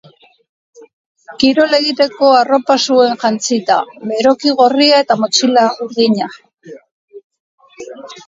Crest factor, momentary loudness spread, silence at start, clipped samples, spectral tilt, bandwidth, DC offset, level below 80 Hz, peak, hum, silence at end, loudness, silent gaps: 14 dB; 8 LU; 1.3 s; under 0.1%; -3 dB/octave; 7.8 kHz; under 0.1%; -60 dBFS; 0 dBFS; none; 0.1 s; -12 LUFS; 6.54-6.58 s, 6.91-7.08 s, 7.24-7.30 s, 7.40-7.58 s